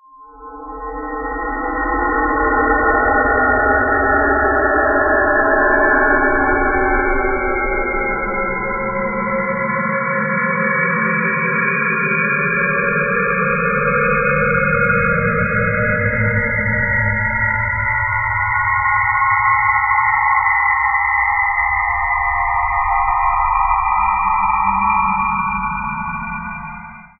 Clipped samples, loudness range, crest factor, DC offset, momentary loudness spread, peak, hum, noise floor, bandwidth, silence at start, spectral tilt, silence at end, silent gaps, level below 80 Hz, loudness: under 0.1%; 4 LU; 14 dB; under 0.1%; 6 LU; -2 dBFS; none; -38 dBFS; 2.7 kHz; 0.2 s; -15 dB/octave; 0.15 s; none; -32 dBFS; -16 LUFS